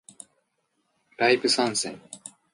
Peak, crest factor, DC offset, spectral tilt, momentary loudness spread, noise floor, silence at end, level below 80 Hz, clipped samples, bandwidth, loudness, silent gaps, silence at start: -8 dBFS; 20 dB; under 0.1%; -2 dB/octave; 21 LU; -74 dBFS; 0.25 s; -76 dBFS; under 0.1%; 11.5 kHz; -23 LUFS; none; 1.2 s